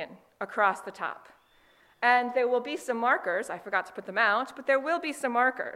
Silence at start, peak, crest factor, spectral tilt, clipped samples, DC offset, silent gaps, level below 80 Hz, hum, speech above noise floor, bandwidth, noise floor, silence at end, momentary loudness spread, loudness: 0 s; -8 dBFS; 20 dB; -3 dB/octave; under 0.1%; under 0.1%; none; -78 dBFS; none; 34 dB; 15.5 kHz; -62 dBFS; 0 s; 12 LU; -28 LUFS